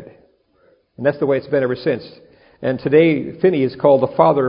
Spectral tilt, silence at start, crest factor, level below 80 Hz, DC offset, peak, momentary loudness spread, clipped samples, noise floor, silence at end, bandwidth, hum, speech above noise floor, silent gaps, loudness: -12 dB/octave; 0 s; 18 dB; -56 dBFS; under 0.1%; 0 dBFS; 9 LU; under 0.1%; -57 dBFS; 0 s; 5.4 kHz; none; 41 dB; none; -17 LUFS